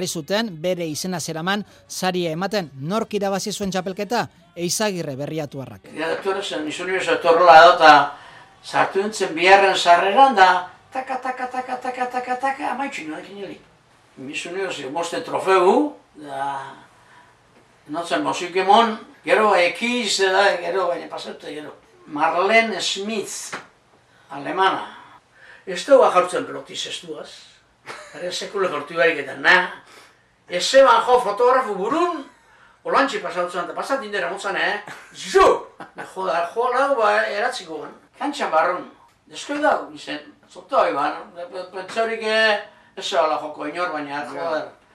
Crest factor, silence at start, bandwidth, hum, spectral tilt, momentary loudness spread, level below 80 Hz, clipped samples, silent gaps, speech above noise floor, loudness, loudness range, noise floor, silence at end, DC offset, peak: 20 dB; 0 s; 16 kHz; none; -3.5 dB/octave; 19 LU; -60 dBFS; under 0.1%; none; 35 dB; -19 LUFS; 10 LU; -55 dBFS; 0.25 s; under 0.1%; 0 dBFS